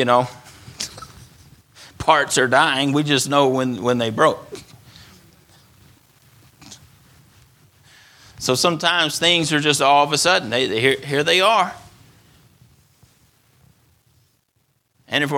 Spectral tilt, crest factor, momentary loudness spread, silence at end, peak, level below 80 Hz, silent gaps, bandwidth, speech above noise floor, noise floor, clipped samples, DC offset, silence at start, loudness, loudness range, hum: -3 dB/octave; 20 dB; 15 LU; 0 s; 0 dBFS; -56 dBFS; none; 18.5 kHz; 49 dB; -66 dBFS; under 0.1%; under 0.1%; 0 s; -18 LUFS; 10 LU; none